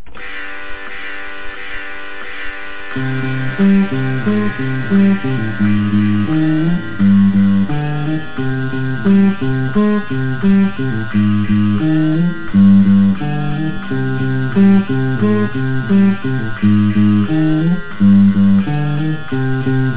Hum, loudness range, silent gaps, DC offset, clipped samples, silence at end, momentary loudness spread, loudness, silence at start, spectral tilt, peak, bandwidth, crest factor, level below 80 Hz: none; 5 LU; none; 7%; under 0.1%; 0 s; 15 LU; -14 LUFS; 0.05 s; -12 dB/octave; 0 dBFS; 4 kHz; 12 dB; -40 dBFS